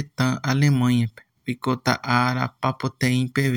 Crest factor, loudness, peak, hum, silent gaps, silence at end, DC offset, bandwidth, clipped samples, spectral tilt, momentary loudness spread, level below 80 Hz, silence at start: 20 dB; -22 LUFS; -2 dBFS; none; none; 0 s; under 0.1%; 17 kHz; under 0.1%; -6 dB/octave; 9 LU; -58 dBFS; 0 s